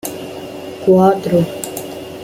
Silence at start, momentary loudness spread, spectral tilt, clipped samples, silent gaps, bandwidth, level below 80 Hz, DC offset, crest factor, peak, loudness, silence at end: 0.05 s; 17 LU; -6.5 dB/octave; under 0.1%; none; 16.5 kHz; -52 dBFS; under 0.1%; 14 dB; -2 dBFS; -15 LUFS; 0 s